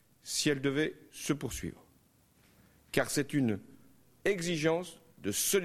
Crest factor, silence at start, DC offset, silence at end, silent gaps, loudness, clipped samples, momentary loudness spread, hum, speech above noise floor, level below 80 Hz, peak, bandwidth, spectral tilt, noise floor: 22 dB; 0.25 s; under 0.1%; 0 s; none; -33 LUFS; under 0.1%; 11 LU; none; 34 dB; -60 dBFS; -12 dBFS; 15 kHz; -4 dB/octave; -66 dBFS